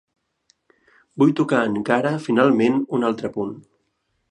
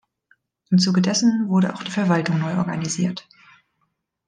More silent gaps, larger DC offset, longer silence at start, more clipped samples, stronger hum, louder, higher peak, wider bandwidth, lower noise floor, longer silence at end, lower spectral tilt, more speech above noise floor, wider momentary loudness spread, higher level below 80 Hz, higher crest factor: neither; neither; first, 1.15 s vs 0.7 s; neither; neither; about the same, -20 LUFS vs -21 LUFS; first, -2 dBFS vs -6 dBFS; about the same, 10 kHz vs 9.8 kHz; about the same, -71 dBFS vs -72 dBFS; second, 0.7 s vs 1.05 s; first, -7 dB/octave vs -5 dB/octave; about the same, 52 dB vs 53 dB; first, 13 LU vs 7 LU; about the same, -66 dBFS vs -66 dBFS; about the same, 20 dB vs 16 dB